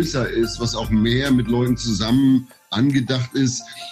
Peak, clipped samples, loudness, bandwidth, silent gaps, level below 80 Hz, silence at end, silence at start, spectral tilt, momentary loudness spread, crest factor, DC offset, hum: -8 dBFS; under 0.1%; -20 LUFS; 15 kHz; none; -38 dBFS; 0 s; 0 s; -5.5 dB/octave; 5 LU; 12 dB; under 0.1%; none